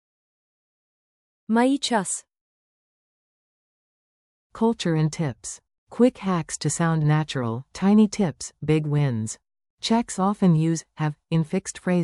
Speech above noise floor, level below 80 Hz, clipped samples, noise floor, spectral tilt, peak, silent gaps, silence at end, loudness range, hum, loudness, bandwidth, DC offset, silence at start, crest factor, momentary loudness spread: over 68 dB; -58 dBFS; under 0.1%; under -90 dBFS; -6 dB/octave; -6 dBFS; 2.41-4.50 s, 5.78-5.87 s, 9.70-9.78 s; 0 s; 6 LU; none; -23 LUFS; 12 kHz; under 0.1%; 1.5 s; 18 dB; 11 LU